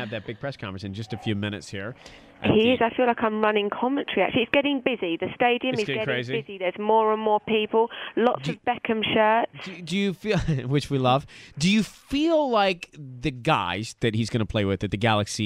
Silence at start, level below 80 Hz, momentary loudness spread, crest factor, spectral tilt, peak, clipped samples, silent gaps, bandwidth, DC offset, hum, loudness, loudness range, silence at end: 0 s; -50 dBFS; 12 LU; 20 dB; -5.5 dB/octave; -4 dBFS; under 0.1%; none; 16 kHz; under 0.1%; none; -24 LUFS; 2 LU; 0 s